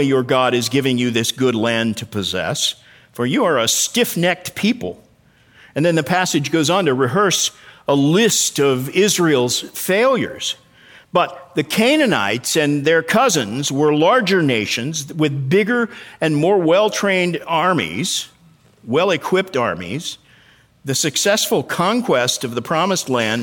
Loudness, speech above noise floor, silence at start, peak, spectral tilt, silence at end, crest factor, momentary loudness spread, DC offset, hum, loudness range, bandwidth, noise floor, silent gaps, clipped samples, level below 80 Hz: -17 LUFS; 36 dB; 0 s; -2 dBFS; -3.5 dB/octave; 0 s; 16 dB; 8 LU; under 0.1%; none; 3 LU; 19.5 kHz; -53 dBFS; none; under 0.1%; -60 dBFS